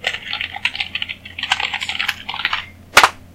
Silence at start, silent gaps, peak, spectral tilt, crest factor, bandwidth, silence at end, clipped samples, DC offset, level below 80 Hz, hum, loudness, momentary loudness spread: 0 s; none; 0 dBFS; -0.5 dB/octave; 20 dB; 17 kHz; 0 s; 0.1%; under 0.1%; -48 dBFS; none; -19 LUFS; 12 LU